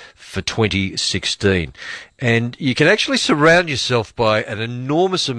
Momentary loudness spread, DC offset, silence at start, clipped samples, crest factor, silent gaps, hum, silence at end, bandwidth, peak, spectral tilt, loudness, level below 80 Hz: 11 LU; under 0.1%; 0 s; under 0.1%; 16 dB; none; none; 0 s; 11 kHz; -2 dBFS; -4.5 dB/octave; -17 LUFS; -44 dBFS